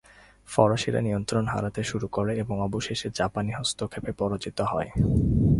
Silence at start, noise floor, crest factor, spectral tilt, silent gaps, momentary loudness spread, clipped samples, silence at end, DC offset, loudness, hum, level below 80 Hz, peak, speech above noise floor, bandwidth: 0.5 s; -51 dBFS; 22 dB; -6 dB/octave; none; 7 LU; under 0.1%; 0 s; under 0.1%; -27 LUFS; none; -40 dBFS; -4 dBFS; 25 dB; 11.5 kHz